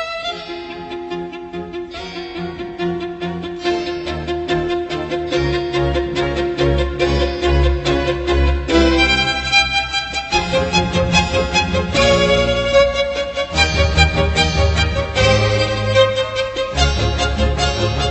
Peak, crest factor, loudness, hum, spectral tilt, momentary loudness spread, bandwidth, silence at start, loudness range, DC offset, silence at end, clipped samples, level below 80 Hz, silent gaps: 0 dBFS; 16 dB; -17 LUFS; none; -5 dB/octave; 13 LU; 8.4 kHz; 0 s; 9 LU; under 0.1%; 0 s; under 0.1%; -24 dBFS; none